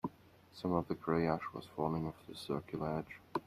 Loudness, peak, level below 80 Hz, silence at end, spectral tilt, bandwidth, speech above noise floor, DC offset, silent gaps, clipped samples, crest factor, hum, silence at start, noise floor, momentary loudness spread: -39 LUFS; -18 dBFS; -66 dBFS; 0.05 s; -7.5 dB/octave; 14.5 kHz; 23 dB; under 0.1%; none; under 0.1%; 20 dB; none; 0.05 s; -61 dBFS; 11 LU